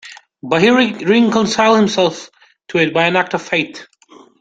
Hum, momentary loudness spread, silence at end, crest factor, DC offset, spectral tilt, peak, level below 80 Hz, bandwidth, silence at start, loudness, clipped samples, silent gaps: none; 9 LU; 0.55 s; 14 dB; under 0.1%; -4.5 dB/octave; -2 dBFS; -56 dBFS; 9 kHz; 0.05 s; -14 LUFS; under 0.1%; none